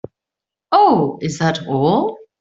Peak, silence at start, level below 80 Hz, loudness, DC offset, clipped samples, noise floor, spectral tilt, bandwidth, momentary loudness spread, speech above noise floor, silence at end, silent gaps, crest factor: -2 dBFS; 0.7 s; -56 dBFS; -16 LUFS; under 0.1%; under 0.1%; -86 dBFS; -6 dB/octave; 8 kHz; 8 LU; 70 dB; 0.25 s; none; 16 dB